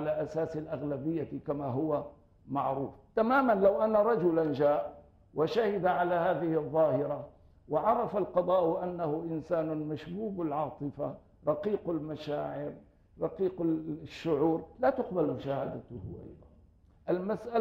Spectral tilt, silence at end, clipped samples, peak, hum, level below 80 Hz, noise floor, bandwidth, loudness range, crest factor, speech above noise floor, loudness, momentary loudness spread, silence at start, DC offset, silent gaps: -8.5 dB/octave; 0 s; under 0.1%; -14 dBFS; none; -62 dBFS; -61 dBFS; 16 kHz; 6 LU; 18 dB; 30 dB; -31 LUFS; 12 LU; 0 s; under 0.1%; none